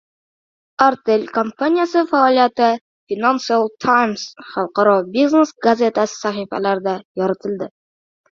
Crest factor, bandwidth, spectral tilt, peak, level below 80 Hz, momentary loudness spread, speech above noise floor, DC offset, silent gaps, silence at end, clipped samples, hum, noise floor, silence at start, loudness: 18 dB; 7.6 kHz; -5 dB/octave; 0 dBFS; -64 dBFS; 11 LU; over 73 dB; under 0.1%; 2.81-3.07 s, 7.05-7.15 s; 0.7 s; under 0.1%; none; under -90 dBFS; 0.8 s; -17 LUFS